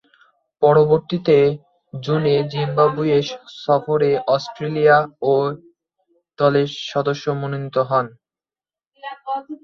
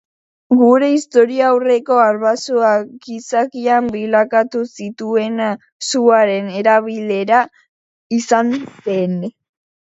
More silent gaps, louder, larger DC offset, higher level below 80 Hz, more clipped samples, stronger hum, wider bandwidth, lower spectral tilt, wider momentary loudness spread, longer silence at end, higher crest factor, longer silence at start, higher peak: second, 8.87-8.91 s vs 5.72-5.80 s, 7.69-8.10 s; second, -19 LUFS vs -15 LUFS; neither; about the same, -60 dBFS vs -64 dBFS; neither; neither; second, 6.8 kHz vs 8 kHz; first, -7 dB/octave vs -5 dB/octave; first, 15 LU vs 11 LU; second, 0.1 s vs 0.6 s; about the same, 18 dB vs 16 dB; about the same, 0.6 s vs 0.5 s; about the same, -2 dBFS vs 0 dBFS